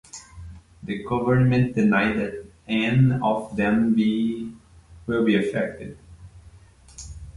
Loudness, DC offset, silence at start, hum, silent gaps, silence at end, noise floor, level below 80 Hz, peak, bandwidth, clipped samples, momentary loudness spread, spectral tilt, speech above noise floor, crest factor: -22 LUFS; under 0.1%; 0.15 s; none; none; 0.05 s; -50 dBFS; -48 dBFS; -8 dBFS; 11 kHz; under 0.1%; 21 LU; -7.5 dB/octave; 28 dB; 16 dB